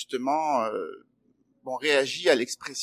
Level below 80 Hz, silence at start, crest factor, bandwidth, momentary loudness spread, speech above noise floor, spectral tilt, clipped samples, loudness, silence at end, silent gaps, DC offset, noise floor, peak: -80 dBFS; 0 s; 20 dB; 16 kHz; 13 LU; 41 dB; -2.5 dB/octave; under 0.1%; -26 LUFS; 0 s; none; under 0.1%; -68 dBFS; -8 dBFS